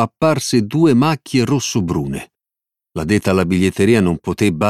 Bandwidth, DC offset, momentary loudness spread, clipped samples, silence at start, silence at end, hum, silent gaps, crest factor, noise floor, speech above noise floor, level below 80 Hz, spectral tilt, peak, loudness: 14.5 kHz; under 0.1%; 9 LU; under 0.1%; 0 s; 0 s; none; none; 14 dB; -86 dBFS; 71 dB; -44 dBFS; -6 dB/octave; -2 dBFS; -16 LUFS